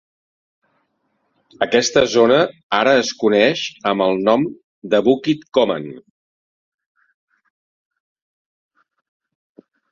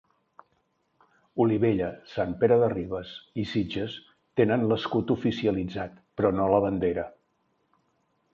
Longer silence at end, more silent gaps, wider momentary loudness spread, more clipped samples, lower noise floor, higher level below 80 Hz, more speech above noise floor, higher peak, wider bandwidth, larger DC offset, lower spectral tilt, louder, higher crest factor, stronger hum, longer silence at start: first, 3.9 s vs 1.25 s; first, 2.63-2.70 s, 4.64-4.82 s vs none; second, 9 LU vs 13 LU; neither; about the same, -69 dBFS vs -72 dBFS; about the same, -58 dBFS vs -54 dBFS; first, 52 dB vs 47 dB; first, -2 dBFS vs -8 dBFS; about the same, 7.6 kHz vs 7.2 kHz; neither; second, -4 dB/octave vs -8.5 dB/octave; first, -17 LUFS vs -27 LUFS; about the same, 18 dB vs 20 dB; neither; first, 1.6 s vs 1.35 s